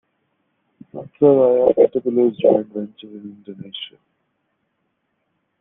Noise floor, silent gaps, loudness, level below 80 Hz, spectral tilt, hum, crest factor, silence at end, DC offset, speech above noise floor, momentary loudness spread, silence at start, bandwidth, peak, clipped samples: -71 dBFS; none; -16 LUFS; -64 dBFS; -10.5 dB/octave; none; 20 dB; 1.75 s; under 0.1%; 54 dB; 23 LU; 0.95 s; 3.9 kHz; 0 dBFS; under 0.1%